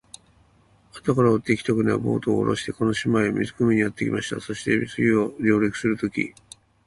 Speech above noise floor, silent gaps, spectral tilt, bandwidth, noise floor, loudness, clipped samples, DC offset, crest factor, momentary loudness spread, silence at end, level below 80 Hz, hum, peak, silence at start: 36 dB; none; -6.5 dB/octave; 11.5 kHz; -58 dBFS; -23 LUFS; under 0.1%; under 0.1%; 18 dB; 7 LU; 0.6 s; -54 dBFS; none; -6 dBFS; 0.95 s